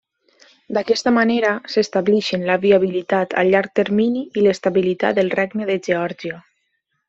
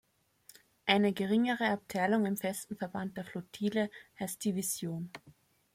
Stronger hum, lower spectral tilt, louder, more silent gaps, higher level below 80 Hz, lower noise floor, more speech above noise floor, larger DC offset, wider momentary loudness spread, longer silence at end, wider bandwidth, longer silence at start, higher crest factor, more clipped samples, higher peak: neither; about the same, -5.5 dB/octave vs -4.5 dB/octave; first, -18 LUFS vs -33 LUFS; neither; first, -62 dBFS vs -74 dBFS; first, -71 dBFS vs -63 dBFS; first, 53 dB vs 30 dB; neither; second, 7 LU vs 13 LU; first, 0.7 s vs 0.45 s; second, 7.8 kHz vs 16 kHz; second, 0.7 s vs 0.85 s; second, 16 dB vs 22 dB; neither; first, -2 dBFS vs -12 dBFS